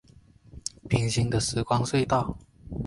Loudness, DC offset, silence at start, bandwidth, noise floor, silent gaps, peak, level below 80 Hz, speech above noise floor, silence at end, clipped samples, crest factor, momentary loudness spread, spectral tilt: -27 LUFS; under 0.1%; 0.55 s; 11.5 kHz; -55 dBFS; none; -8 dBFS; -46 dBFS; 30 dB; 0 s; under 0.1%; 20 dB; 13 LU; -5 dB/octave